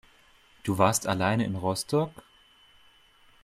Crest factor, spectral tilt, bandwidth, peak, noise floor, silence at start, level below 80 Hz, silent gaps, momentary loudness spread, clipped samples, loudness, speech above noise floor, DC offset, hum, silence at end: 22 dB; -5 dB/octave; 16 kHz; -6 dBFS; -59 dBFS; 0.65 s; -62 dBFS; none; 9 LU; under 0.1%; -27 LUFS; 33 dB; under 0.1%; none; 1.3 s